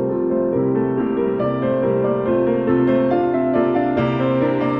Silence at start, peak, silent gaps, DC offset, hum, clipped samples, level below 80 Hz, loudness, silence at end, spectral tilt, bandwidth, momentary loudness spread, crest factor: 0 s; -6 dBFS; none; under 0.1%; none; under 0.1%; -48 dBFS; -18 LUFS; 0 s; -10.5 dB/octave; 5.2 kHz; 3 LU; 12 dB